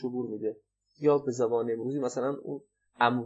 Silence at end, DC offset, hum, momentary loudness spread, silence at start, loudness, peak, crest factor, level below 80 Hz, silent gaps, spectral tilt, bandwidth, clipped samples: 0 s; under 0.1%; none; 12 LU; 0 s; -30 LUFS; -10 dBFS; 20 dB; -82 dBFS; none; -6 dB/octave; 8.2 kHz; under 0.1%